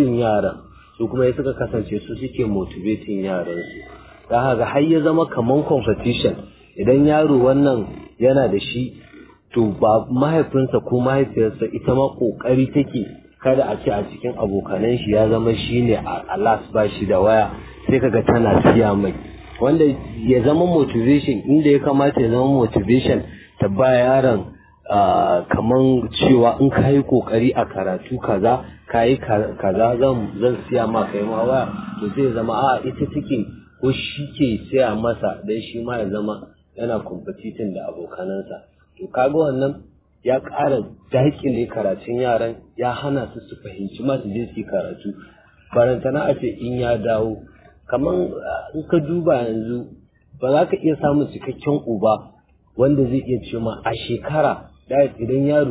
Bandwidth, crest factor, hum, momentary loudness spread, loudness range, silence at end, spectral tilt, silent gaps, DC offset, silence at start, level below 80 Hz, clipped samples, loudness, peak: 4 kHz; 18 dB; none; 12 LU; 7 LU; 0 s; -11.5 dB/octave; none; under 0.1%; 0 s; -42 dBFS; under 0.1%; -19 LUFS; -2 dBFS